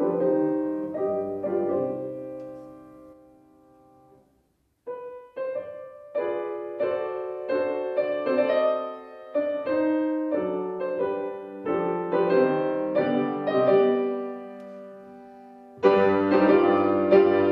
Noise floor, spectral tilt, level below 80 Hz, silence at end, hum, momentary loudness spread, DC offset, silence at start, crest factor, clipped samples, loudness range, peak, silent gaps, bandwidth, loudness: -69 dBFS; -8.5 dB/octave; -70 dBFS; 0 s; none; 20 LU; under 0.1%; 0 s; 20 dB; under 0.1%; 13 LU; -6 dBFS; none; 5.4 kHz; -25 LUFS